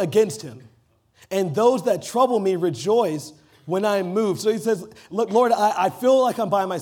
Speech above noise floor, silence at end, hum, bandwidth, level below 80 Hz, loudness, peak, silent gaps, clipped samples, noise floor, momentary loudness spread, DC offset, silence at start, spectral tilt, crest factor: 39 dB; 0 s; none; 18 kHz; -70 dBFS; -21 LUFS; -6 dBFS; none; under 0.1%; -60 dBFS; 9 LU; under 0.1%; 0 s; -5.5 dB/octave; 16 dB